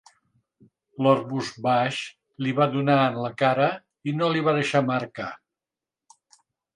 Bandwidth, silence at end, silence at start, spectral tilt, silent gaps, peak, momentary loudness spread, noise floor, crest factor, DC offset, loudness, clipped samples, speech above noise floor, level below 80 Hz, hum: 11 kHz; 1.4 s; 1 s; -6.5 dB/octave; none; -6 dBFS; 12 LU; -89 dBFS; 20 dB; under 0.1%; -24 LUFS; under 0.1%; 66 dB; -70 dBFS; none